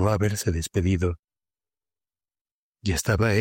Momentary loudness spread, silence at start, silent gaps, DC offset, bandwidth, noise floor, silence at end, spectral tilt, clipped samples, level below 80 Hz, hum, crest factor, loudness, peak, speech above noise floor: 8 LU; 0 s; 1.19-1.23 s, 2.41-2.45 s, 2.51-2.73 s; under 0.1%; 16.5 kHz; under -90 dBFS; 0 s; -5.5 dB/octave; under 0.1%; -40 dBFS; none; 16 dB; -25 LUFS; -10 dBFS; over 67 dB